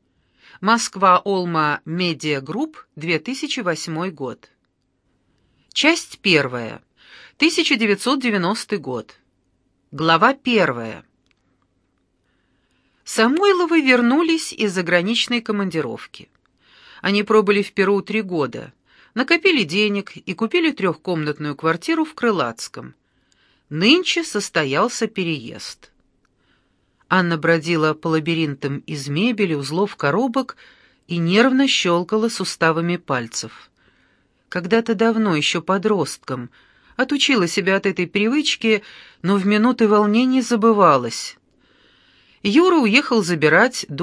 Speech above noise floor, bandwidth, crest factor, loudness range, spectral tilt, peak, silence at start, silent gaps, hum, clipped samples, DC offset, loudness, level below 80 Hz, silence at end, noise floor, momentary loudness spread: 50 dB; 11 kHz; 20 dB; 5 LU; -4.5 dB/octave; 0 dBFS; 0.6 s; none; none; under 0.1%; under 0.1%; -19 LUFS; -66 dBFS; 0 s; -68 dBFS; 14 LU